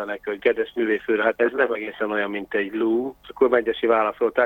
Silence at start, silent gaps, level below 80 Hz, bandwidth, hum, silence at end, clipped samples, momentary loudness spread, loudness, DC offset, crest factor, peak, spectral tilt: 0 s; none; -60 dBFS; 17 kHz; none; 0 s; under 0.1%; 6 LU; -22 LUFS; under 0.1%; 18 dB; -4 dBFS; -6.5 dB/octave